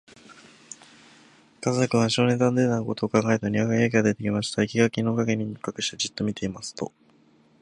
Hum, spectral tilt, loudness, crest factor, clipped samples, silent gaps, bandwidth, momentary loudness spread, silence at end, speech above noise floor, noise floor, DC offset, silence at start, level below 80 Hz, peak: none; -5.5 dB/octave; -24 LUFS; 20 dB; under 0.1%; none; 11 kHz; 13 LU; 0.75 s; 35 dB; -59 dBFS; under 0.1%; 0.3 s; -58 dBFS; -4 dBFS